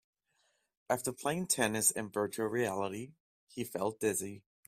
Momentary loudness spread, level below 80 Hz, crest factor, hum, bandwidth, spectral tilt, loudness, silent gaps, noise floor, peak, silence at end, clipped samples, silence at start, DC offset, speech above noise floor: 15 LU; -72 dBFS; 22 dB; none; 16 kHz; -3 dB/octave; -34 LUFS; 3.20-3.47 s; -77 dBFS; -14 dBFS; 0.3 s; under 0.1%; 0.9 s; under 0.1%; 42 dB